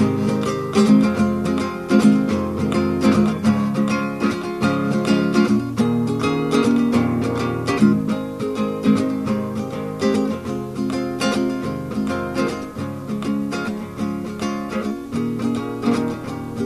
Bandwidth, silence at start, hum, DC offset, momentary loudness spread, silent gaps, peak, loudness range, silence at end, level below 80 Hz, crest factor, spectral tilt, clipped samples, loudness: 13.5 kHz; 0 s; none; 0.1%; 9 LU; none; -2 dBFS; 7 LU; 0 s; -48 dBFS; 18 dB; -6.5 dB/octave; under 0.1%; -20 LUFS